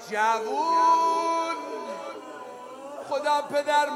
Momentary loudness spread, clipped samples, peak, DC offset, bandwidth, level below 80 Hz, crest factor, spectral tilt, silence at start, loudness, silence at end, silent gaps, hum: 19 LU; under 0.1%; -12 dBFS; under 0.1%; 15 kHz; -86 dBFS; 14 dB; -2 dB/octave; 0 s; -25 LUFS; 0 s; none; none